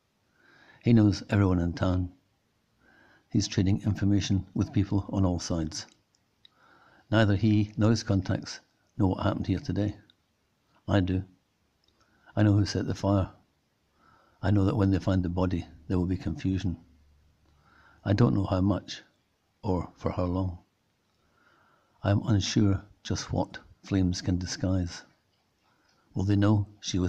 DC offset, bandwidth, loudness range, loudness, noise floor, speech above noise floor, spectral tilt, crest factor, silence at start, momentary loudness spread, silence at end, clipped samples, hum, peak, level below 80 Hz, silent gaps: under 0.1%; 8.2 kHz; 4 LU; -28 LUFS; -72 dBFS; 46 dB; -6.5 dB/octave; 18 dB; 0.85 s; 12 LU; 0 s; under 0.1%; none; -10 dBFS; -54 dBFS; none